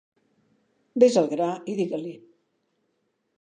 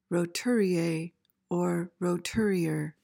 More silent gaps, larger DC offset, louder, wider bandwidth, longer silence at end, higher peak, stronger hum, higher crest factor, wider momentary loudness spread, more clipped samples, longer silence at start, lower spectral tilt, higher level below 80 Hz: neither; neither; first, -24 LUFS vs -29 LUFS; second, 9.6 kHz vs 17 kHz; first, 1.25 s vs 0.1 s; first, -4 dBFS vs -16 dBFS; neither; first, 22 dB vs 12 dB; first, 15 LU vs 7 LU; neither; first, 0.95 s vs 0.1 s; about the same, -6 dB/octave vs -6 dB/octave; second, -80 dBFS vs -62 dBFS